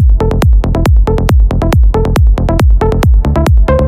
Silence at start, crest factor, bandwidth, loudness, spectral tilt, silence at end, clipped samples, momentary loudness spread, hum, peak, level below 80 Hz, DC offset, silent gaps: 0 s; 6 dB; 15 kHz; -10 LUFS; -7.5 dB/octave; 0 s; under 0.1%; 1 LU; none; 0 dBFS; -10 dBFS; under 0.1%; none